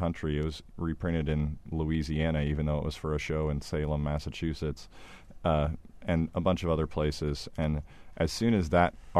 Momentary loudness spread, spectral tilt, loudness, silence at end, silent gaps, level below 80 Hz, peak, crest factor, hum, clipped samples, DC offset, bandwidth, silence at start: 9 LU; -7 dB/octave; -31 LUFS; 0 s; none; -40 dBFS; -10 dBFS; 20 dB; none; under 0.1%; under 0.1%; 13 kHz; 0 s